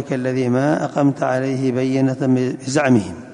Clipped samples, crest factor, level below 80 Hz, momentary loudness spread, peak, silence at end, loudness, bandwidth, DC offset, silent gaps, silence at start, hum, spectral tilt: under 0.1%; 14 dB; -54 dBFS; 4 LU; -4 dBFS; 0 s; -18 LUFS; 10.5 kHz; under 0.1%; none; 0 s; none; -7 dB/octave